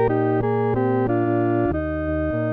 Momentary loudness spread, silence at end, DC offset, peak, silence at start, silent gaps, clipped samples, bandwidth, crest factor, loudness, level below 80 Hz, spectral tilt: 4 LU; 0 s; under 0.1%; -8 dBFS; 0 s; none; under 0.1%; 4.1 kHz; 12 dB; -21 LUFS; -38 dBFS; -11.5 dB/octave